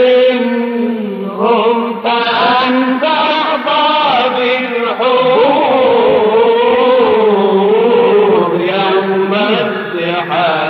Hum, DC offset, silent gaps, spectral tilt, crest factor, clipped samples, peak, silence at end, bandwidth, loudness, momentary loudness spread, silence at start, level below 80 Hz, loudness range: none; under 0.1%; none; -7 dB/octave; 10 dB; under 0.1%; 0 dBFS; 0 s; 5.8 kHz; -11 LUFS; 6 LU; 0 s; -58 dBFS; 3 LU